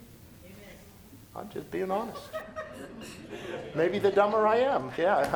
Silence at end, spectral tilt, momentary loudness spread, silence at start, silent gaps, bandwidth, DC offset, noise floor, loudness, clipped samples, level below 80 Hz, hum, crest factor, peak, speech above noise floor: 0 s; -5.5 dB/octave; 23 LU; 0 s; none; over 20 kHz; under 0.1%; -51 dBFS; -28 LUFS; under 0.1%; -60 dBFS; none; 20 dB; -10 dBFS; 23 dB